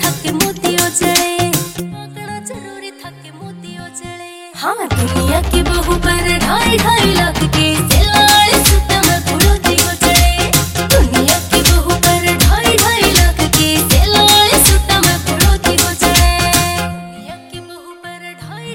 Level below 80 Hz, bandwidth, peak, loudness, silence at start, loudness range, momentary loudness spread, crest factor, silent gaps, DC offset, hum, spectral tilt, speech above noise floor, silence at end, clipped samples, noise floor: -20 dBFS; 17.5 kHz; 0 dBFS; -11 LUFS; 0 s; 10 LU; 21 LU; 12 dB; none; under 0.1%; none; -3 dB/octave; 21 dB; 0 s; under 0.1%; -33 dBFS